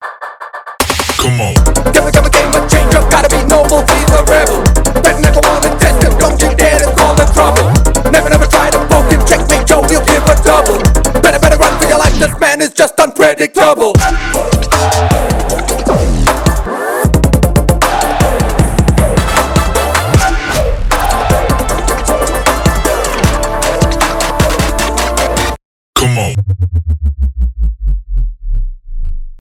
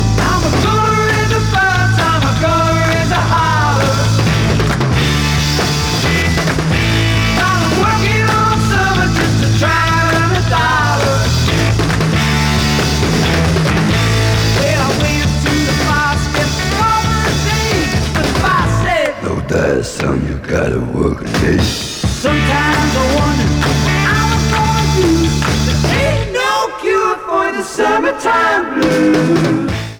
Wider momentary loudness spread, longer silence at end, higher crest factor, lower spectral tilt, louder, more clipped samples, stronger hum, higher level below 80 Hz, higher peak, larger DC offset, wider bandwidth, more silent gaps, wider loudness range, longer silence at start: first, 8 LU vs 4 LU; about the same, 0.05 s vs 0 s; about the same, 10 dB vs 12 dB; about the same, -4.5 dB/octave vs -5 dB/octave; first, -10 LUFS vs -13 LUFS; first, 0.2% vs under 0.1%; neither; first, -14 dBFS vs -24 dBFS; about the same, 0 dBFS vs -2 dBFS; neither; second, 18 kHz vs 20 kHz; first, 25.65-25.93 s vs none; about the same, 4 LU vs 2 LU; about the same, 0 s vs 0 s